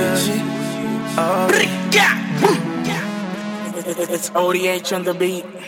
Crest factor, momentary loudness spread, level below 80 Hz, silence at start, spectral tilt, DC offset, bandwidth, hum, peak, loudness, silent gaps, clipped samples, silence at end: 18 dB; 11 LU; -62 dBFS; 0 s; -4 dB/octave; under 0.1%; 17.5 kHz; none; 0 dBFS; -19 LUFS; none; under 0.1%; 0 s